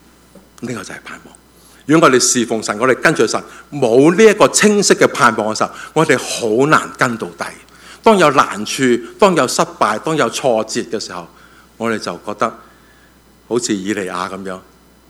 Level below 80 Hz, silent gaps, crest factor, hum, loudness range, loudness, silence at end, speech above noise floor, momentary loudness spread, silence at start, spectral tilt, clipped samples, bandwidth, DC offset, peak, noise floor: -54 dBFS; none; 16 dB; none; 10 LU; -14 LUFS; 0.5 s; 33 dB; 17 LU; 0.6 s; -3.5 dB/octave; 0.1%; 16.5 kHz; under 0.1%; 0 dBFS; -48 dBFS